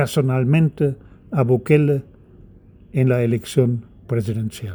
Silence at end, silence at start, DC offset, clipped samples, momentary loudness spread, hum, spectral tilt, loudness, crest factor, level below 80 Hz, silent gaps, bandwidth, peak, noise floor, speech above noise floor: 0 s; 0 s; under 0.1%; under 0.1%; 10 LU; none; -7.5 dB/octave; -20 LUFS; 18 dB; -50 dBFS; none; over 20 kHz; -2 dBFS; -46 dBFS; 28 dB